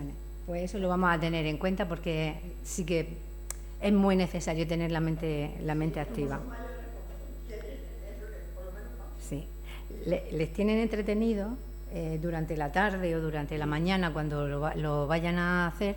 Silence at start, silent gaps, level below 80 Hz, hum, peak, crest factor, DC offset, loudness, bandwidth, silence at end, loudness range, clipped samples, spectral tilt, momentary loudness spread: 0 s; none; -40 dBFS; none; -14 dBFS; 18 dB; under 0.1%; -31 LUFS; 18 kHz; 0 s; 9 LU; under 0.1%; -6 dB/octave; 15 LU